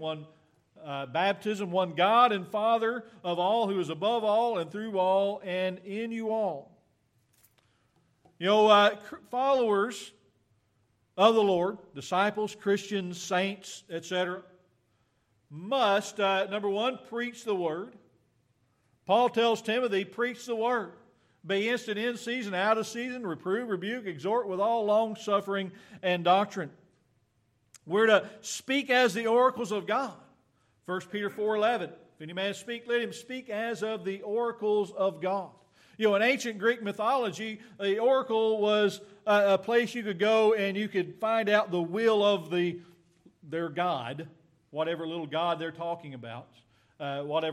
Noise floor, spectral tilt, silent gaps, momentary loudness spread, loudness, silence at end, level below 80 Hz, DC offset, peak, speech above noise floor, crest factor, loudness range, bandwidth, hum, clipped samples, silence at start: -72 dBFS; -4.5 dB/octave; none; 14 LU; -28 LUFS; 0 s; -80 dBFS; under 0.1%; -8 dBFS; 43 dB; 22 dB; 6 LU; 14 kHz; none; under 0.1%; 0 s